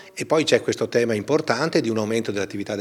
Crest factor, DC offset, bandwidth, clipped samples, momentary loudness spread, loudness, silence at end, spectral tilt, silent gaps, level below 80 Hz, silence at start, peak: 20 dB; under 0.1%; 14.5 kHz; under 0.1%; 7 LU; -22 LUFS; 0 s; -4.5 dB/octave; none; -70 dBFS; 0 s; -2 dBFS